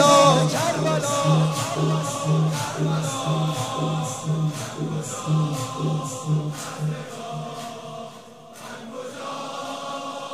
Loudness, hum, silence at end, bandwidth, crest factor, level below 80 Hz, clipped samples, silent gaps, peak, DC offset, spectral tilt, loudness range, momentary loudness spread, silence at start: -24 LUFS; none; 0 s; 15 kHz; 22 dB; -62 dBFS; under 0.1%; none; -2 dBFS; 0.2%; -5 dB/octave; 11 LU; 15 LU; 0 s